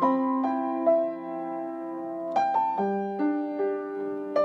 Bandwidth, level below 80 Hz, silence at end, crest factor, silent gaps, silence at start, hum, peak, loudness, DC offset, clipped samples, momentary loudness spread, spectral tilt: 6.8 kHz; -88 dBFS; 0 s; 16 dB; none; 0 s; none; -12 dBFS; -28 LUFS; under 0.1%; under 0.1%; 10 LU; -8 dB/octave